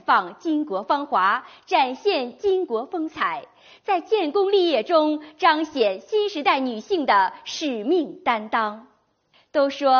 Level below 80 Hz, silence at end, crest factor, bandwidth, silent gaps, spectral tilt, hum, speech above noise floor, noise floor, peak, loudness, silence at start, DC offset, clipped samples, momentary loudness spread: -68 dBFS; 0 s; 18 dB; 6.8 kHz; none; -0.5 dB/octave; none; 40 dB; -62 dBFS; -4 dBFS; -22 LUFS; 0.1 s; under 0.1%; under 0.1%; 7 LU